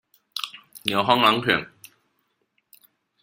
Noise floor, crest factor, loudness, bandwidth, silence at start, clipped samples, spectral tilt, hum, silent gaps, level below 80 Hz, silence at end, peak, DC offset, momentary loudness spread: -72 dBFS; 24 dB; -22 LUFS; 16.5 kHz; 0.35 s; under 0.1%; -4 dB/octave; none; none; -64 dBFS; 1.55 s; -2 dBFS; under 0.1%; 17 LU